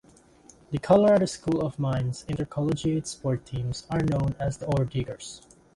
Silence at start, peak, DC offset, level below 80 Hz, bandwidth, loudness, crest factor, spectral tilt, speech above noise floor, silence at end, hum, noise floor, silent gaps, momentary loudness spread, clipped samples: 0.7 s; -8 dBFS; under 0.1%; -48 dBFS; 11.5 kHz; -27 LUFS; 18 dB; -7 dB/octave; 29 dB; 0.35 s; none; -55 dBFS; none; 13 LU; under 0.1%